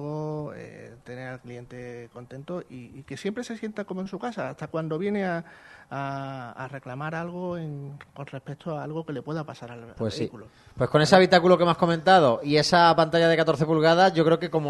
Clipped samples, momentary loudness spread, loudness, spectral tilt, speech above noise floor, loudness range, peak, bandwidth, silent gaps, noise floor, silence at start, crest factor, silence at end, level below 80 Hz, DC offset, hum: under 0.1%; 22 LU; -24 LUFS; -5.5 dB/octave; 19 dB; 16 LU; 0 dBFS; 12 kHz; none; -44 dBFS; 0 s; 24 dB; 0 s; -60 dBFS; under 0.1%; none